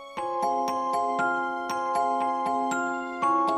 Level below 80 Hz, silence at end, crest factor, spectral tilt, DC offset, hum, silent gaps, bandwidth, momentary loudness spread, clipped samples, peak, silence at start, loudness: -70 dBFS; 0 s; 12 dB; -4 dB/octave; under 0.1%; none; none; 14.5 kHz; 4 LU; under 0.1%; -14 dBFS; 0 s; -27 LUFS